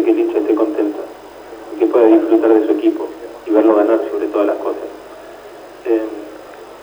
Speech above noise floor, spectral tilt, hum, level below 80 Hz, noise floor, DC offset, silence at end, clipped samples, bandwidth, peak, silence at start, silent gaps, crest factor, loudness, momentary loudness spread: 22 dB; -6 dB/octave; none; -58 dBFS; -36 dBFS; under 0.1%; 0 s; under 0.1%; over 20 kHz; 0 dBFS; 0 s; none; 16 dB; -15 LUFS; 23 LU